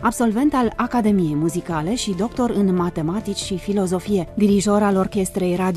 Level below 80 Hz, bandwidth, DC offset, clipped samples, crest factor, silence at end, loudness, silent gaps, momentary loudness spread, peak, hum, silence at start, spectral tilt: -42 dBFS; 14 kHz; under 0.1%; under 0.1%; 14 dB; 0 s; -20 LUFS; none; 6 LU; -6 dBFS; none; 0 s; -6 dB/octave